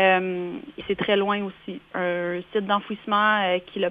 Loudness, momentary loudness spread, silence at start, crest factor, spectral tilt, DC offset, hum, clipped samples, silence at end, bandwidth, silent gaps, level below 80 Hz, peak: -24 LUFS; 13 LU; 0 s; 18 dB; -7.5 dB/octave; under 0.1%; none; under 0.1%; 0 s; 5 kHz; none; -62 dBFS; -6 dBFS